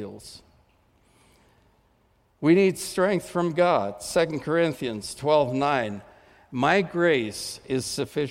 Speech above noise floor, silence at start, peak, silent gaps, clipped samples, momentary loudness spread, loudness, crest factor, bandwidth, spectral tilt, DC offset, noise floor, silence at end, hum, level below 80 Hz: 40 dB; 0 s; -8 dBFS; none; under 0.1%; 12 LU; -24 LUFS; 18 dB; 16.5 kHz; -5 dB/octave; under 0.1%; -64 dBFS; 0 s; none; -60 dBFS